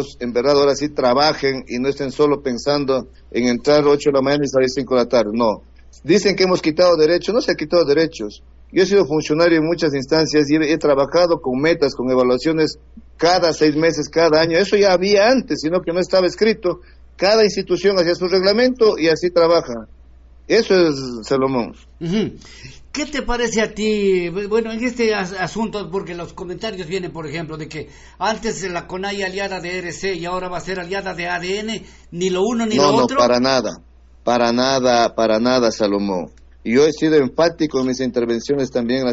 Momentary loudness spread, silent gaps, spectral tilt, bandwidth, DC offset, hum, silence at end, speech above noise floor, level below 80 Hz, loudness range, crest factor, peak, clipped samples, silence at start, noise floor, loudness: 12 LU; none; -3.5 dB/octave; 8 kHz; under 0.1%; none; 0 s; 27 dB; -44 dBFS; 8 LU; 14 dB; -2 dBFS; under 0.1%; 0 s; -44 dBFS; -17 LUFS